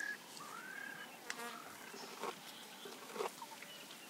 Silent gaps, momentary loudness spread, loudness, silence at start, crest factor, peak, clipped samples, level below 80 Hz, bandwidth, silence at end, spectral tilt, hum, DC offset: none; 6 LU; -48 LUFS; 0 s; 26 dB; -22 dBFS; under 0.1%; under -90 dBFS; 16 kHz; 0 s; -1.5 dB/octave; none; under 0.1%